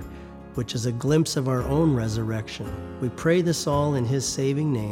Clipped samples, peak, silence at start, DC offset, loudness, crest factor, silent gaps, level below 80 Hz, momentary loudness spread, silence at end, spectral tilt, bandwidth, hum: under 0.1%; -8 dBFS; 0 s; under 0.1%; -25 LUFS; 16 dB; none; -44 dBFS; 11 LU; 0 s; -6 dB/octave; 17 kHz; none